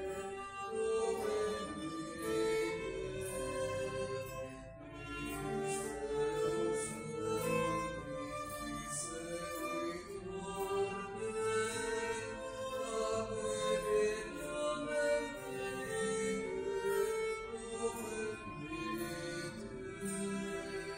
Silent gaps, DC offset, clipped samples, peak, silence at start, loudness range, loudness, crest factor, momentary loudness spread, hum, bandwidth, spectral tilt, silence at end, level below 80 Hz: none; under 0.1%; under 0.1%; -22 dBFS; 0 s; 4 LU; -39 LUFS; 16 dB; 8 LU; none; 16 kHz; -4 dB/octave; 0 s; -60 dBFS